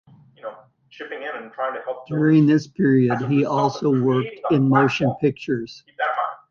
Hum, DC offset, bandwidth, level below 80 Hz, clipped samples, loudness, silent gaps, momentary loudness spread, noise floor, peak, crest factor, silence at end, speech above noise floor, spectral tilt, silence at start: none; under 0.1%; 7 kHz; -60 dBFS; under 0.1%; -20 LUFS; none; 18 LU; -46 dBFS; -4 dBFS; 16 dB; 0.15 s; 26 dB; -8 dB/octave; 0.45 s